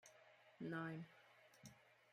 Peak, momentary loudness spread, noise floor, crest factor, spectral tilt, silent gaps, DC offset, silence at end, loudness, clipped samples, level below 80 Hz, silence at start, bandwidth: -34 dBFS; 19 LU; -70 dBFS; 20 dB; -6 dB/octave; none; under 0.1%; 0 s; -52 LUFS; under 0.1%; under -90 dBFS; 0.05 s; 15 kHz